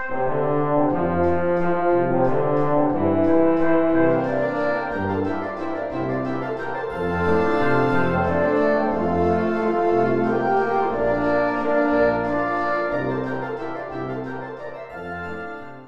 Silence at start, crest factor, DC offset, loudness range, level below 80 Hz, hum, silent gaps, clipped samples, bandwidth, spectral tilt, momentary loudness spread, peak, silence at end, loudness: 0 s; 14 dB; under 0.1%; 5 LU; -46 dBFS; none; none; under 0.1%; 7.4 kHz; -9 dB/octave; 11 LU; -6 dBFS; 0 s; -21 LUFS